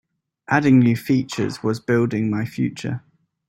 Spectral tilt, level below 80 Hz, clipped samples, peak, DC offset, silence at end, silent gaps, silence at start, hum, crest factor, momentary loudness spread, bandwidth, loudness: -7 dB/octave; -58 dBFS; under 0.1%; -2 dBFS; under 0.1%; 0.5 s; none; 0.5 s; none; 18 dB; 11 LU; 14.5 kHz; -20 LUFS